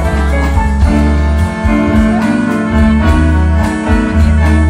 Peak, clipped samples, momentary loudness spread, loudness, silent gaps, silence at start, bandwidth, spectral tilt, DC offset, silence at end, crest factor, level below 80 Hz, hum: 0 dBFS; under 0.1%; 3 LU; -11 LUFS; none; 0 s; 11 kHz; -7.5 dB/octave; under 0.1%; 0 s; 10 dB; -14 dBFS; none